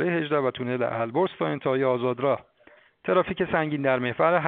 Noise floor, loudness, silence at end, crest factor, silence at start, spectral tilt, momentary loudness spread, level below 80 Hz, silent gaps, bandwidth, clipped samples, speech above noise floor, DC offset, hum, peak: -57 dBFS; -25 LUFS; 0 s; 18 dB; 0 s; -5 dB/octave; 4 LU; -60 dBFS; none; 4.4 kHz; under 0.1%; 32 dB; under 0.1%; none; -6 dBFS